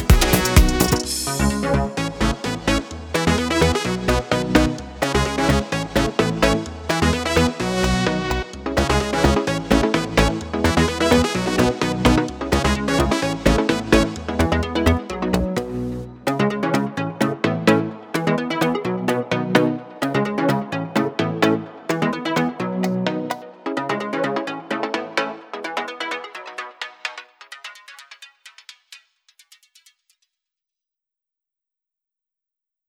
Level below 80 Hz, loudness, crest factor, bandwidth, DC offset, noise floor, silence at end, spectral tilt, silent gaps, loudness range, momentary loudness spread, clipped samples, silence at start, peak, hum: -30 dBFS; -21 LUFS; 20 dB; over 20 kHz; under 0.1%; -87 dBFS; 3.9 s; -5 dB/octave; none; 8 LU; 10 LU; under 0.1%; 0 s; 0 dBFS; none